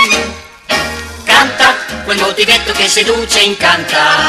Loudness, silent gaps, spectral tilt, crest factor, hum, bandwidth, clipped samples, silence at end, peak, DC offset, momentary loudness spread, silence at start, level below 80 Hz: -10 LUFS; none; -1 dB/octave; 12 dB; none; 17 kHz; 0.2%; 0 s; 0 dBFS; under 0.1%; 10 LU; 0 s; -36 dBFS